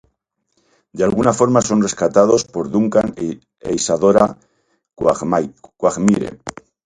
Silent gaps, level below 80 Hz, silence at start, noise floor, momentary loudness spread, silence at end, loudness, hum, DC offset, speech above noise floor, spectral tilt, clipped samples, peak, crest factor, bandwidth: none; -48 dBFS; 0.95 s; -69 dBFS; 14 LU; 0.35 s; -16 LUFS; none; under 0.1%; 53 dB; -5.5 dB/octave; under 0.1%; 0 dBFS; 18 dB; 11 kHz